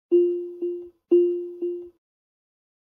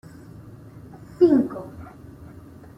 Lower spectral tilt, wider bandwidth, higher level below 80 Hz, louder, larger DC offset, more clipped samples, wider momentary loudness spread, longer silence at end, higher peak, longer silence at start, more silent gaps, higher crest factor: about the same, -9 dB/octave vs -9 dB/octave; second, 3 kHz vs 5.8 kHz; second, -78 dBFS vs -56 dBFS; second, -24 LUFS vs -20 LUFS; neither; neither; second, 13 LU vs 26 LU; first, 1.1 s vs 0.5 s; second, -10 dBFS vs -6 dBFS; second, 0.1 s vs 0.45 s; neither; about the same, 16 dB vs 20 dB